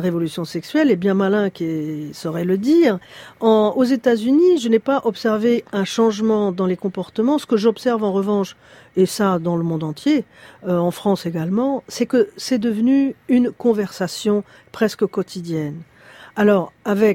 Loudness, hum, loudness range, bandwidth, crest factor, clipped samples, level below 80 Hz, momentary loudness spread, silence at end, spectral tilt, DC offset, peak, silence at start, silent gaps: -19 LUFS; none; 4 LU; 16.5 kHz; 16 dB; under 0.1%; -62 dBFS; 10 LU; 0 s; -6.5 dB/octave; under 0.1%; -2 dBFS; 0 s; none